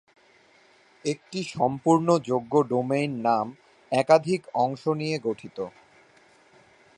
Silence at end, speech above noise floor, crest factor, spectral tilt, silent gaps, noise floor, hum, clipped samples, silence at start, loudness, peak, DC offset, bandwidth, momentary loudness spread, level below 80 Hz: 1.3 s; 34 dB; 22 dB; -6 dB/octave; none; -58 dBFS; none; under 0.1%; 1.05 s; -25 LUFS; -4 dBFS; under 0.1%; 11 kHz; 13 LU; -70 dBFS